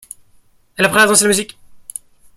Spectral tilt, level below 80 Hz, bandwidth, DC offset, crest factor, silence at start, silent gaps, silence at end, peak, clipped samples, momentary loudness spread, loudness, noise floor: -2 dB/octave; -56 dBFS; 16.5 kHz; under 0.1%; 18 dB; 0.8 s; none; 0.6 s; 0 dBFS; under 0.1%; 22 LU; -12 LUFS; -51 dBFS